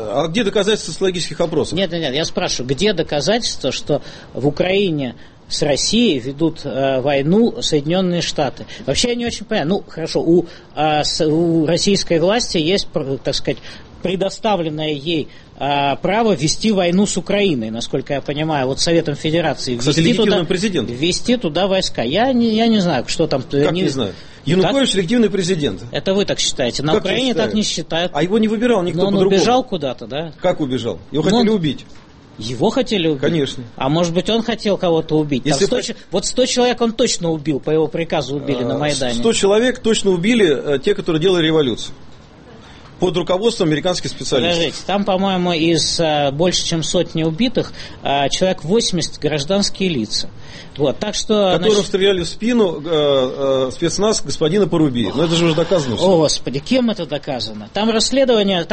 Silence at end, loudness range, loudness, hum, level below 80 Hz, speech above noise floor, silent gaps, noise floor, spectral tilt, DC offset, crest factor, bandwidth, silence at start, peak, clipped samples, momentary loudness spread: 0 s; 3 LU; -17 LUFS; none; -40 dBFS; 23 dB; none; -40 dBFS; -4.5 dB/octave; under 0.1%; 14 dB; 8.8 kHz; 0 s; -2 dBFS; under 0.1%; 7 LU